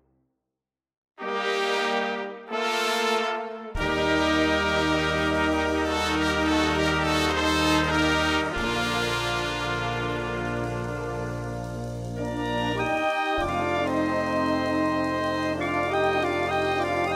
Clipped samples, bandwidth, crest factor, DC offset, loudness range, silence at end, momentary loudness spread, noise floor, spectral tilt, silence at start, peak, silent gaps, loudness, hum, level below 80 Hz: under 0.1%; 16 kHz; 18 dB; under 0.1%; 5 LU; 0 s; 9 LU; -87 dBFS; -4.5 dB/octave; 1.2 s; -8 dBFS; none; -25 LUFS; none; -42 dBFS